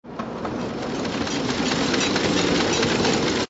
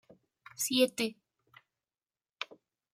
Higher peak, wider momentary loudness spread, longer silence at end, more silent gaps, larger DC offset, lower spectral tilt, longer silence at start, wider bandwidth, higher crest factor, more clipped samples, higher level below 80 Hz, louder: first, -8 dBFS vs -14 dBFS; second, 9 LU vs 15 LU; second, 0.05 s vs 0.5 s; neither; neither; first, -3.5 dB/octave vs -2 dB/octave; second, 0.05 s vs 0.6 s; second, 8 kHz vs 16 kHz; second, 16 dB vs 22 dB; neither; first, -46 dBFS vs -84 dBFS; first, -22 LUFS vs -33 LUFS